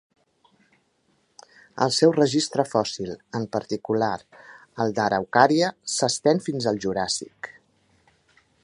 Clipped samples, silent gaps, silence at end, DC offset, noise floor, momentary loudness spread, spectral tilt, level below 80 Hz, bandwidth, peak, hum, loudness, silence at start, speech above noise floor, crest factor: under 0.1%; none; 1.15 s; under 0.1%; -67 dBFS; 15 LU; -4 dB/octave; -62 dBFS; 11 kHz; 0 dBFS; none; -23 LUFS; 1.75 s; 44 dB; 24 dB